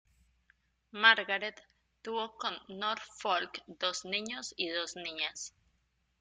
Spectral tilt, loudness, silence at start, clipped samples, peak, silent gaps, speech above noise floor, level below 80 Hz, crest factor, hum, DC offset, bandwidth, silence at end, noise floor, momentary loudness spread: -1 dB/octave; -33 LUFS; 0.95 s; under 0.1%; -8 dBFS; none; 42 dB; -76 dBFS; 28 dB; none; under 0.1%; 9.6 kHz; 0.7 s; -76 dBFS; 17 LU